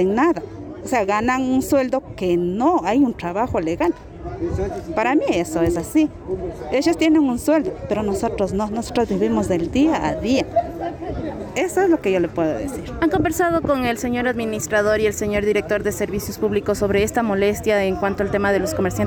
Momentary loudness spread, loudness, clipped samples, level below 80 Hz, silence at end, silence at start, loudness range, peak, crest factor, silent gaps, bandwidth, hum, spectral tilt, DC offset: 8 LU; -20 LUFS; under 0.1%; -40 dBFS; 0 s; 0 s; 2 LU; -8 dBFS; 12 dB; none; over 20 kHz; none; -5.5 dB/octave; under 0.1%